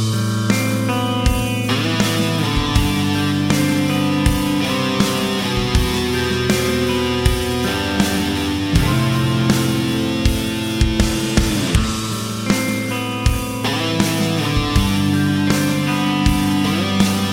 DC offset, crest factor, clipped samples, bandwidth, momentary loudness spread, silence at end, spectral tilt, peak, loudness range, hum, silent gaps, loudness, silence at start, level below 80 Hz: under 0.1%; 16 dB; under 0.1%; 17 kHz; 3 LU; 0 s; -5 dB/octave; 0 dBFS; 2 LU; none; none; -18 LUFS; 0 s; -26 dBFS